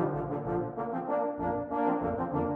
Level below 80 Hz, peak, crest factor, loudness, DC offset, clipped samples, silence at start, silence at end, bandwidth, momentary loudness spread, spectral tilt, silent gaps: -54 dBFS; -16 dBFS; 16 dB; -32 LUFS; under 0.1%; under 0.1%; 0 s; 0 s; 4 kHz; 4 LU; -11 dB/octave; none